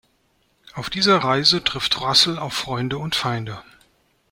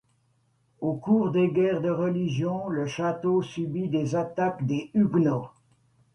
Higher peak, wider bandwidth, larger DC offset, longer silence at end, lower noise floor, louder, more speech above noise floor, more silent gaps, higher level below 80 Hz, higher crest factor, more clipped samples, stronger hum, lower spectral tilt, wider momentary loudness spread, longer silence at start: first, -2 dBFS vs -12 dBFS; first, 16.5 kHz vs 9.2 kHz; neither; about the same, 0.7 s vs 0.65 s; second, -64 dBFS vs -68 dBFS; first, -19 LUFS vs -26 LUFS; about the same, 43 dB vs 43 dB; neither; first, -52 dBFS vs -64 dBFS; first, 22 dB vs 16 dB; neither; neither; second, -3.5 dB/octave vs -8 dB/octave; first, 16 LU vs 8 LU; about the same, 0.75 s vs 0.8 s